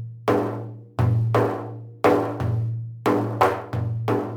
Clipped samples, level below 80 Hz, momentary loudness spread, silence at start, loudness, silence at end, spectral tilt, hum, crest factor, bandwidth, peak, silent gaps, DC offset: under 0.1%; -58 dBFS; 9 LU; 0 s; -23 LUFS; 0 s; -8 dB/octave; none; 18 dB; 18 kHz; -4 dBFS; none; under 0.1%